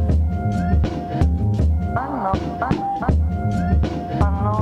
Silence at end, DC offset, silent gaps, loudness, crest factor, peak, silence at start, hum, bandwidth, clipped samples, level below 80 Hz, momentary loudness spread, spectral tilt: 0 s; under 0.1%; none; -21 LUFS; 16 dB; -4 dBFS; 0 s; none; 7.2 kHz; under 0.1%; -24 dBFS; 3 LU; -9 dB/octave